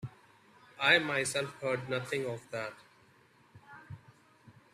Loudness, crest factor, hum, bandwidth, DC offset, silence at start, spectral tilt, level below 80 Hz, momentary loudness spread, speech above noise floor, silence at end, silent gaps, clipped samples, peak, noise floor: -31 LUFS; 26 dB; none; 14 kHz; under 0.1%; 0 s; -3 dB/octave; -74 dBFS; 25 LU; 32 dB; 0.25 s; none; under 0.1%; -10 dBFS; -64 dBFS